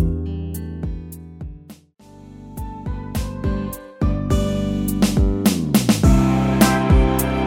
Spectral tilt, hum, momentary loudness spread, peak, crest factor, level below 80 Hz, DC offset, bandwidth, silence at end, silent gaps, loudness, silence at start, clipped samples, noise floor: -6 dB/octave; none; 19 LU; -2 dBFS; 18 dB; -26 dBFS; under 0.1%; 19 kHz; 0 s; none; -19 LUFS; 0 s; under 0.1%; -46 dBFS